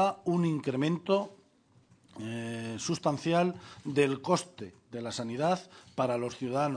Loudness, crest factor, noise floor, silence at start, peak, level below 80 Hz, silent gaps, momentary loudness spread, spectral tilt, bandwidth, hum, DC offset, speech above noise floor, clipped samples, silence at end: -31 LUFS; 20 dB; -64 dBFS; 0 s; -12 dBFS; -72 dBFS; none; 14 LU; -5.5 dB/octave; 10 kHz; none; under 0.1%; 33 dB; under 0.1%; 0 s